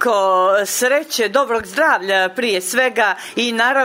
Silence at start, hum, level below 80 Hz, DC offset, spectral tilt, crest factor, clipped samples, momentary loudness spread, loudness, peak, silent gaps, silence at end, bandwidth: 0 s; none; -60 dBFS; under 0.1%; -1.5 dB/octave; 14 dB; under 0.1%; 4 LU; -16 LUFS; -2 dBFS; none; 0 s; 16.5 kHz